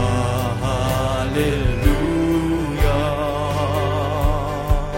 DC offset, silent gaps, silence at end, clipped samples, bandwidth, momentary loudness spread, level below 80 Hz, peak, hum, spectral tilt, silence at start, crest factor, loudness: under 0.1%; none; 0 s; under 0.1%; 16.5 kHz; 3 LU; -24 dBFS; -2 dBFS; none; -6.5 dB/octave; 0 s; 16 dB; -20 LUFS